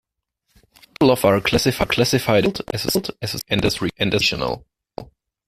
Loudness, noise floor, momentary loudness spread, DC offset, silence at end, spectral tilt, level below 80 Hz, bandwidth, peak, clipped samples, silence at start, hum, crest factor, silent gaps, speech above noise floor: -19 LUFS; -72 dBFS; 14 LU; under 0.1%; 0.45 s; -4.5 dB/octave; -44 dBFS; 16 kHz; -2 dBFS; under 0.1%; 1 s; none; 18 dB; none; 52 dB